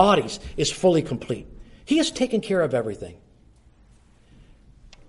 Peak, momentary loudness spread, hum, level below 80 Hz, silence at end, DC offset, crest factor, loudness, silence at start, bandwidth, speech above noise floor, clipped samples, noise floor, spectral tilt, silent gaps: -2 dBFS; 13 LU; none; -48 dBFS; 1.95 s; under 0.1%; 22 dB; -23 LUFS; 0 s; 11.5 kHz; 32 dB; under 0.1%; -54 dBFS; -5 dB/octave; none